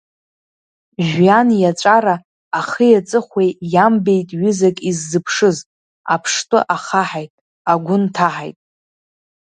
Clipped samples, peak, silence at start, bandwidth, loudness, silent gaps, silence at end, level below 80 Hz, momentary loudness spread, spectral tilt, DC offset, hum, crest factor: under 0.1%; 0 dBFS; 1 s; 9.6 kHz; -16 LUFS; 2.25-2.51 s, 5.66-6.04 s, 7.30-7.65 s; 1 s; -62 dBFS; 12 LU; -5 dB/octave; under 0.1%; none; 16 dB